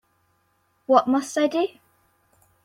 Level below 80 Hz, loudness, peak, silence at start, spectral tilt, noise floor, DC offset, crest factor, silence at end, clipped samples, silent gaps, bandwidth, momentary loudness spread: -70 dBFS; -22 LUFS; -2 dBFS; 0.9 s; -4 dB/octave; -68 dBFS; under 0.1%; 22 dB; 0.95 s; under 0.1%; none; 15 kHz; 10 LU